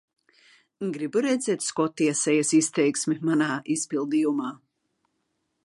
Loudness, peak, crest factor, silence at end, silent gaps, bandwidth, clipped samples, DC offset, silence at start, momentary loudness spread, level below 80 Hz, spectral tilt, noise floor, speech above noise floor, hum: -25 LUFS; -10 dBFS; 16 dB; 1.1 s; none; 11.5 kHz; under 0.1%; under 0.1%; 0.8 s; 9 LU; -78 dBFS; -4 dB/octave; -76 dBFS; 52 dB; none